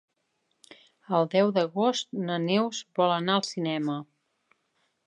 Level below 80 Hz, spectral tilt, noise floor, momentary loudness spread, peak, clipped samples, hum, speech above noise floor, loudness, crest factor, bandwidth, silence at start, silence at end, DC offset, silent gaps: -82 dBFS; -5 dB/octave; -76 dBFS; 7 LU; -10 dBFS; under 0.1%; none; 50 dB; -27 LUFS; 18 dB; 11.5 kHz; 1.1 s; 1.05 s; under 0.1%; none